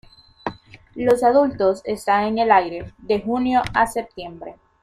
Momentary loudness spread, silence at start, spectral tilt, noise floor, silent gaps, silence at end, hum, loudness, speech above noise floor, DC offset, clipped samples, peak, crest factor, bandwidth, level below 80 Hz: 18 LU; 0.45 s; -5.5 dB/octave; -41 dBFS; none; 0.3 s; none; -19 LUFS; 21 dB; under 0.1%; under 0.1%; -2 dBFS; 20 dB; 15 kHz; -50 dBFS